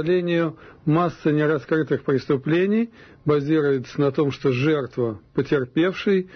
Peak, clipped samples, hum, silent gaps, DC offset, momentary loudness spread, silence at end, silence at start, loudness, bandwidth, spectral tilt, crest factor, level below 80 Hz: -10 dBFS; under 0.1%; none; none; under 0.1%; 6 LU; 0 s; 0 s; -22 LUFS; 6.4 kHz; -8 dB/octave; 12 dB; -58 dBFS